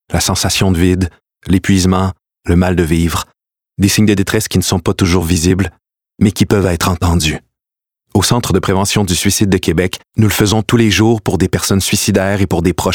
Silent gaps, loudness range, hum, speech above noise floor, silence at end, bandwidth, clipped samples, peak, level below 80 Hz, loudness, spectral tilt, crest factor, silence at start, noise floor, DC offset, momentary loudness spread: none; 2 LU; none; 74 dB; 0 s; 18.5 kHz; under 0.1%; 0 dBFS; -30 dBFS; -13 LUFS; -5 dB/octave; 14 dB; 0.1 s; -86 dBFS; 0.3%; 6 LU